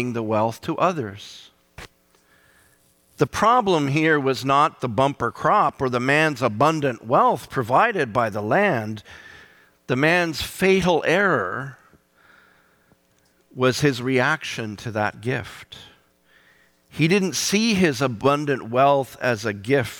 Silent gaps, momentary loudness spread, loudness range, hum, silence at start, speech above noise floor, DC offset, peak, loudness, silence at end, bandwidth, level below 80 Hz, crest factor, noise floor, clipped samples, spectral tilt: none; 11 LU; 5 LU; none; 0 s; 41 dB; under 0.1%; -6 dBFS; -21 LUFS; 0 s; 18.5 kHz; -54 dBFS; 16 dB; -62 dBFS; under 0.1%; -5 dB/octave